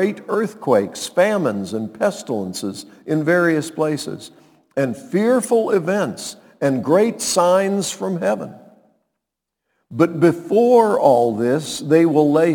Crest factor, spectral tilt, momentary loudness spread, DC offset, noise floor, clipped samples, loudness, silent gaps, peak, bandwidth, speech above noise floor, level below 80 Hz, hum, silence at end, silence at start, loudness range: 18 dB; -5.5 dB/octave; 12 LU; under 0.1%; -81 dBFS; under 0.1%; -18 LUFS; none; 0 dBFS; 19 kHz; 64 dB; -68 dBFS; none; 0 s; 0 s; 4 LU